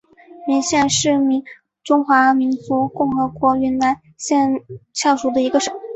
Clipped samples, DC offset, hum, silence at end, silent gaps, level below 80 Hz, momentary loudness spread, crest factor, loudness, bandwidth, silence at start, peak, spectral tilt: under 0.1%; under 0.1%; none; 0 s; none; -54 dBFS; 8 LU; 16 dB; -18 LUFS; 8.2 kHz; 0.35 s; -2 dBFS; -3.5 dB/octave